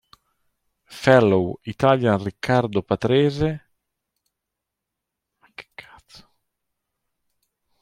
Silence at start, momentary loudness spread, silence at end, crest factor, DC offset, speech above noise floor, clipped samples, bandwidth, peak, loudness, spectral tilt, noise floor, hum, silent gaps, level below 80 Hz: 0.9 s; 13 LU; 2.2 s; 22 dB; under 0.1%; 64 dB; under 0.1%; 14 kHz; -2 dBFS; -20 LUFS; -7 dB/octave; -83 dBFS; none; none; -54 dBFS